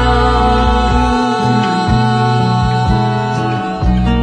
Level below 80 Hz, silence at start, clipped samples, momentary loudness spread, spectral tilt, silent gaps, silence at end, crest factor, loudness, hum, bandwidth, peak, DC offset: -20 dBFS; 0 s; under 0.1%; 4 LU; -6.5 dB/octave; none; 0 s; 12 dB; -13 LUFS; none; 9.8 kHz; 0 dBFS; under 0.1%